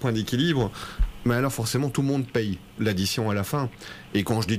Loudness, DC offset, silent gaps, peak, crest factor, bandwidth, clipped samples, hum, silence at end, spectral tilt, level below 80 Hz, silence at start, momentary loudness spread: -26 LUFS; under 0.1%; none; -12 dBFS; 14 dB; 15.5 kHz; under 0.1%; none; 0 s; -5.5 dB/octave; -36 dBFS; 0 s; 7 LU